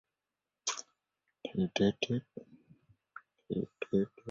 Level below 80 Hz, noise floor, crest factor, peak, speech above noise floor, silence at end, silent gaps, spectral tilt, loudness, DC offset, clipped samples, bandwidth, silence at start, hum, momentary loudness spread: -68 dBFS; under -90 dBFS; 20 dB; -16 dBFS; over 56 dB; 0 s; none; -5 dB/octave; -35 LUFS; under 0.1%; under 0.1%; 8 kHz; 0.65 s; none; 24 LU